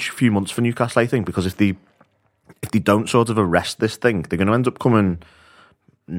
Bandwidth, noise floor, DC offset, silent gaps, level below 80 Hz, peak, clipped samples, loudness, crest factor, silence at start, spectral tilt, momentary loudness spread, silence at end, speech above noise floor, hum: 16.5 kHz; -59 dBFS; under 0.1%; none; -50 dBFS; 0 dBFS; under 0.1%; -19 LUFS; 20 dB; 0 s; -6 dB/octave; 6 LU; 0 s; 40 dB; none